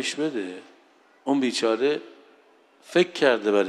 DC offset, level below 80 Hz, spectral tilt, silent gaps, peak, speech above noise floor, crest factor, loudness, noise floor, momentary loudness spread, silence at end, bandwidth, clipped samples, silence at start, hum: under 0.1%; -84 dBFS; -4 dB/octave; none; -4 dBFS; 34 dB; 20 dB; -24 LUFS; -58 dBFS; 14 LU; 0 s; 12.5 kHz; under 0.1%; 0 s; none